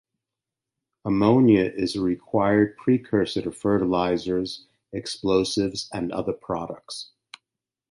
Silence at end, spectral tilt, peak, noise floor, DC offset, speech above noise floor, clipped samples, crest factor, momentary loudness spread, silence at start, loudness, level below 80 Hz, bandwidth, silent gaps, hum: 0.85 s; -6 dB/octave; -6 dBFS; -87 dBFS; under 0.1%; 64 dB; under 0.1%; 18 dB; 16 LU; 1.05 s; -23 LUFS; -54 dBFS; 11.5 kHz; none; none